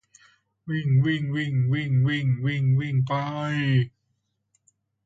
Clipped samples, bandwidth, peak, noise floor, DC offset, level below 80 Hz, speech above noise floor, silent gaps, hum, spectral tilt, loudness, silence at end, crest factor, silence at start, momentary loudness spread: under 0.1%; 7.6 kHz; -10 dBFS; -75 dBFS; under 0.1%; -60 dBFS; 52 dB; none; none; -8 dB/octave; -24 LUFS; 1.15 s; 14 dB; 0.65 s; 6 LU